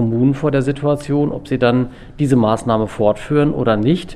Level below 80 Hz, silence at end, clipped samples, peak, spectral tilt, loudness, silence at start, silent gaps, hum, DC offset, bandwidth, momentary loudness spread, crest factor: -40 dBFS; 0 s; under 0.1%; -2 dBFS; -7.5 dB/octave; -17 LUFS; 0 s; none; none; under 0.1%; 12 kHz; 4 LU; 14 dB